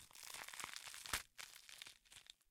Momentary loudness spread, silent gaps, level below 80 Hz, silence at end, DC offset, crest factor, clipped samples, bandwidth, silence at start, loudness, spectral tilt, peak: 14 LU; none; -72 dBFS; 0.15 s; under 0.1%; 30 dB; under 0.1%; 18 kHz; 0 s; -50 LUFS; 0 dB/octave; -24 dBFS